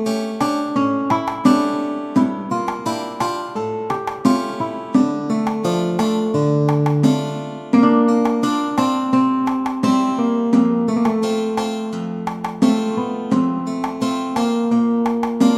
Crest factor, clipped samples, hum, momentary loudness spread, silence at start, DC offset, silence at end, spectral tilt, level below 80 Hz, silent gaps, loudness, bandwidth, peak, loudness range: 16 dB; under 0.1%; none; 8 LU; 0 s; under 0.1%; 0 s; -6.5 dB/octave; -56 dBFS; none; -19 LUFS; 13.5 kHz; -2 dBFS; 4 LU